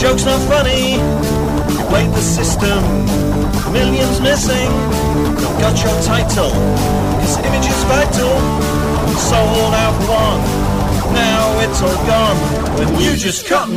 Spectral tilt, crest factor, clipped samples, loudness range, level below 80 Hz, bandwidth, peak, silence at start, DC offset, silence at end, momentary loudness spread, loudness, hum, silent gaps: -5 dB/octave; 12 dB; under 0.1%; 1 LU; -22 dBFS; 15.5 kHz; -2 dBFS; 0 s; under 0.1%; 0 s; 3 LU; -14 LUFS; none; none